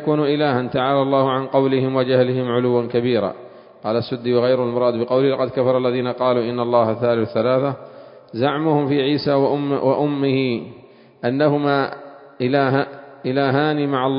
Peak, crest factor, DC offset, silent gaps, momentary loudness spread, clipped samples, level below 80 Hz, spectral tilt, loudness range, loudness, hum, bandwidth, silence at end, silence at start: -2 dBFS; 16 dB; under 0.1%; none; 8 LU; under 0.1%; -60 dBFS; -12 dB/octave; 2 LU; -19 LUFS; none; 5.4 kHz; 0 s; 0 s